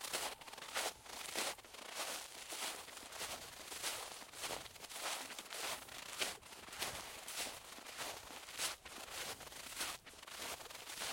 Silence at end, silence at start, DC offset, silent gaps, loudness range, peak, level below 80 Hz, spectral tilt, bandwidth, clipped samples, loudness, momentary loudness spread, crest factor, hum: 0 s; 0 s; under 0.1%; none; 1 LU; -20 dBFS; -72 dBFS; 0 dB/octave; 16.5 kHz; under 0.1%; -45 LUFS; 7 LU; 26 dB; none